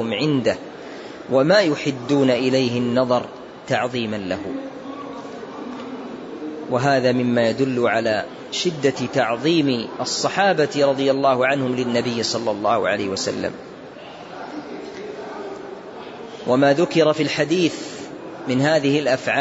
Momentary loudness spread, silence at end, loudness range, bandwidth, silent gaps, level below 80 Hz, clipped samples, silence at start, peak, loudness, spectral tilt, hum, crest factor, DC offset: 17 LU; 0 s; 8 LU; 8 kHz; none; -60 dBFS; under 0.1%; 0 s; -4 dBFS; -20 LUFS; -5 dB/octave; none; 16 dB; under 0.1%